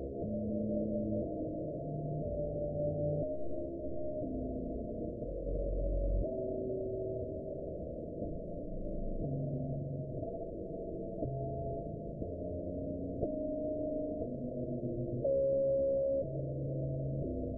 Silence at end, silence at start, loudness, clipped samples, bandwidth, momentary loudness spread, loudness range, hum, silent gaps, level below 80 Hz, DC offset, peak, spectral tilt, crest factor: 0 s; 0 s; -38 LUFS; under 0.1%; 0.9 kHz; 8 LU; 6 LU; none; none; -46 dBFS; under 0.1%; -20 dBFS; -16 dB/octave; 16 dB